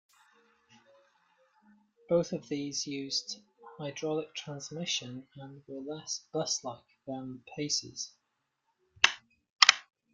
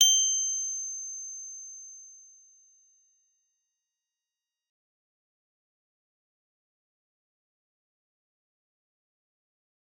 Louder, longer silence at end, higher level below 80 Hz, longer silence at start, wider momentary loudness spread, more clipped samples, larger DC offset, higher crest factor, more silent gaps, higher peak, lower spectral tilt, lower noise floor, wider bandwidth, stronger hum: second, -31 LUFS vs -27 LUFS; second, 0.3 s vs 7.75 s; first, -76 dBFS vs under -90 dBFS; first, 2.1 s vs 0 s; second, 20 LU vs 23 LU; neither; neither; first, 36 dB vs 30 dB; first, 9.50-9.57 s vs none; first, 0 dBFS vs -6 dBFS; first, -2 dB/octave vs 8.5 dB/octave; second, -81 dBFS vs under -90 dBFS; about the same, 11.5 kHz vs 12 kHz; neither